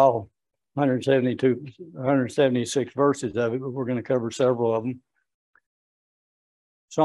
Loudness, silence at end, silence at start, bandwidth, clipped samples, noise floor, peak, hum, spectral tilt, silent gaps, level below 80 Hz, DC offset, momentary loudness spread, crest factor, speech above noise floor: -24 LUFS; 0 s; 0 s; 12 kHz; under 0.1%; under -90 dBFS; -6 dBFS; none; -6 dB/octave; 5.34-5.54 s, 5.66-6.88 s; -68 dBFS; under 0.1%; 10 LU; 20 dB; over 67 dB